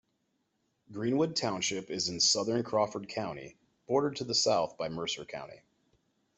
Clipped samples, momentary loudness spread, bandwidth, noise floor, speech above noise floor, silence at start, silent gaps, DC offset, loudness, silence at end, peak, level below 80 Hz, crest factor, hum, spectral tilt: under 0.1%; 17 LU; 8.2 kHz; -78 dBFS; 46 dB; 0.9 s; none; under 0.1%; -31 LUFS; 0.8 s; -14 dBFS; -70 dBFS; 20 dB; none; -3 dB/octave